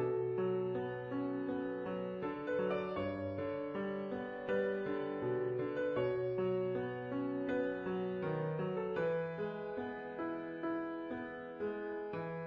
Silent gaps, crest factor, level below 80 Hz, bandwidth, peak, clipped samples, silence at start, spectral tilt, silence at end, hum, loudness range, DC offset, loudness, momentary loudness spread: none; 14 dB; -70 dBFS; 5.6 kHz; -24 dBFS; under 0.1%; 0 s; -9 dB/octave; 0 s; none; 3 LU; under 0.1%; -39 LUFS; 6 LU